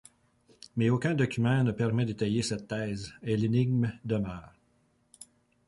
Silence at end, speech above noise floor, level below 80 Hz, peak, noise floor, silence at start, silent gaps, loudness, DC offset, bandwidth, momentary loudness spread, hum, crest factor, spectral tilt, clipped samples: 0.45 s; 41 dB; -58 dBFS; -14 dBFS; -69 dBFS; 0.75 s; none; -30 LUFS; under 0.1%; 11.5 kHz; 10 LU; none; 16 dB; -6.5 dB/octave; under 0.1%